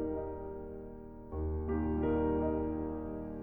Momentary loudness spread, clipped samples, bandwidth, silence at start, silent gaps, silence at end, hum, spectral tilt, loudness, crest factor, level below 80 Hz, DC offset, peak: 14 LU; under 0.1%; 3.5 kHz; 0 s; none; 0 s; none; -12 dB/octave; -36 LUFS; 14 dB; -44 dBFS; under 0.1%; -22 dBFS